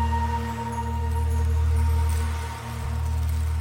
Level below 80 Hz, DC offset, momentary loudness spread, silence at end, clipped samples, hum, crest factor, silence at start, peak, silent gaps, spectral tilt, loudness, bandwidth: -30 dBFS; under 0.1%; 7 LU; 0 s; under 0.1%; none; 10 dB; 0 s; -14 dBFS; none; -6.5 dB/octave; -26 LUFS; 16.5 kHz